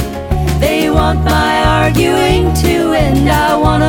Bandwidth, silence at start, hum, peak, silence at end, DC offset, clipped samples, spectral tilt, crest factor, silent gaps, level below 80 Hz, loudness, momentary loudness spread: 18.5 kHz; 0 s; none; 0 dBFS; 0 s; under 0.1%; under 0.1%; -5.5 dB/octave; 10 dB; none; -18 dBFS; -12 LUFS; 2 LU